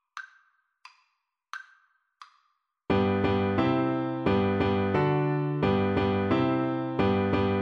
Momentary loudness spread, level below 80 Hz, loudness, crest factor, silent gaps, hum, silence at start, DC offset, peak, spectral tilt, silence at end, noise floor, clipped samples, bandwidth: 15 LU; -52 dBFS; -26 LUFS; 16 dB; none; none; 0.15 s; under 0.1%; -12 dBFS; -8.5 dB/octave; 0 s; -77 dBFS; under 0.1%; 7 kHz